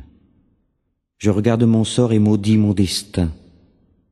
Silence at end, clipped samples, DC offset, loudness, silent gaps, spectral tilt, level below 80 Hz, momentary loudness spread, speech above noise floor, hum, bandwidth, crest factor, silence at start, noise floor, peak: 0.75 s; under 0.1%; under 0.1%; -17 LUFS; none; -6.5 dB/octave; -42 dBFS; 8 LU; 55 dB; none; 12.5 kHz; 16 dB; 0 s; -71 dBFS; -2 dBFS